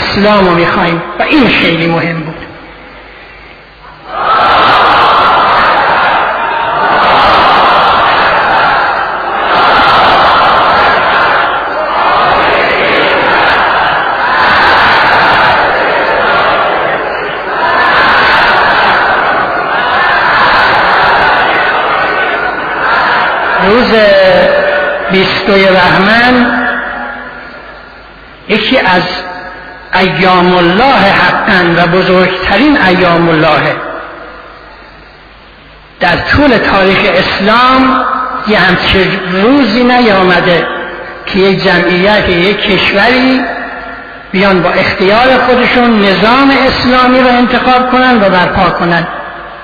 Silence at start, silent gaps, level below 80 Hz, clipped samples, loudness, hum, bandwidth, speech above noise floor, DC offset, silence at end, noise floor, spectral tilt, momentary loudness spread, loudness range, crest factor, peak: 0 s; none; -32 dBFS; 0.6%; -7 LUFS; none; 5.4 kHz; 28 dB; under 0.1%; 0 s; -34 dBFS; -6.5 dB/octave; 9 LU; 4 LU; 8 dB; 0 dBFS